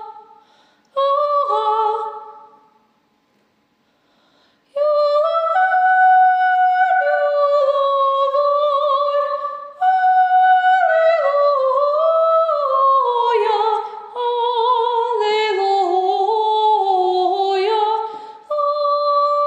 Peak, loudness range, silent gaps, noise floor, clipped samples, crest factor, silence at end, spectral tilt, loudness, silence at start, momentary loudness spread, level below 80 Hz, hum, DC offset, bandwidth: -6 dBFS; 7 LU; none; -62 dBFS; under 0.1%; 12 dB; 0 s; -2 dB/octave; -16 LUFS; 0 s; 8 LU; -86 dBFS; none; under 0.1%; 8.2 kHz